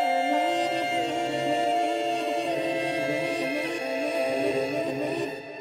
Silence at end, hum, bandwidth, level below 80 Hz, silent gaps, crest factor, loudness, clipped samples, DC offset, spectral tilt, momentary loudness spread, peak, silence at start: 0 s; none; 16 kHz; -70 dBFS; none; 14 dB; -27 LUFS; under 0.1%; under 0.1%; -4 dB/octave; 4 LU; -12 dBFS; 0 s